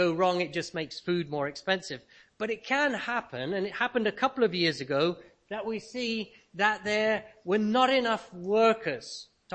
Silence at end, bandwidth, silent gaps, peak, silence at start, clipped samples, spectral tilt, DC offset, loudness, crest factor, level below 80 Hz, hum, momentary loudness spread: 0 s; 8.8 kHz; none; -10 dBFS; 0 s; under 0.1%; -4.5 dB/octave; under 0.1%; -29 LUFS; 20 dB; -68 dBFS; none; 13 LU